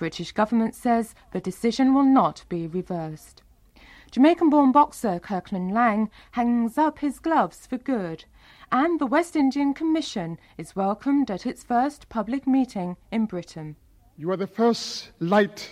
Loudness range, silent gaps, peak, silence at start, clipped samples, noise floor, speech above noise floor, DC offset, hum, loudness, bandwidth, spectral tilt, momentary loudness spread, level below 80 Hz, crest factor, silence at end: 5 LU; none; -6 dBFS; 0 s; under 0.1%; -52 dBFS; 29 dB; under 0.1%; none; -24 LUFS; 13.5 kHz; -6 dB/octave; 14 LU; -56 dBFS; 18 dB; 0 s